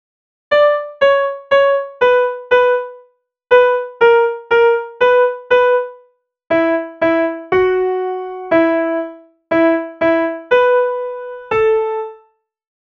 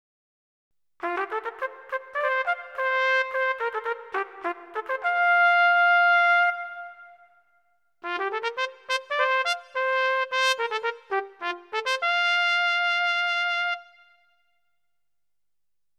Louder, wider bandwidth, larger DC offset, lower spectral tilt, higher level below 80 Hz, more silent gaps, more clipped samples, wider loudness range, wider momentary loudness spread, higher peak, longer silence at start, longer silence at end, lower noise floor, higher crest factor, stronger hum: first, -15 LUFS vs -24 LUFS; second, 6.2 kHz vs 13.5 kHz; neither; first, -6 dB/octave vs 1 dB/octave; first, -54 dBFS vs -82 dBFS; neither; neither; second, 3 LU vs 6 LU; second, 9 LU vs 15 LU; first, 0 dBFS vs -8 dBFS; second, 0.5 s vs 1 s; second, 0.85 s vs 2.15 s; second, -55 dBFS vs -89 dBFS; about the same, 14 dB vs 18 dB; neither